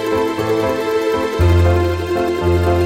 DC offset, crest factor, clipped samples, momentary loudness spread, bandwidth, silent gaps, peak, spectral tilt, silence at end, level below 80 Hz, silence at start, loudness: under 0.1%; 12 dB; under 0.1%; 5 LU; 15.5 kHz; none; -2 dBFS; -7 dB/octave; 0 s; -28 dBFS; 0 s; -16 LUFS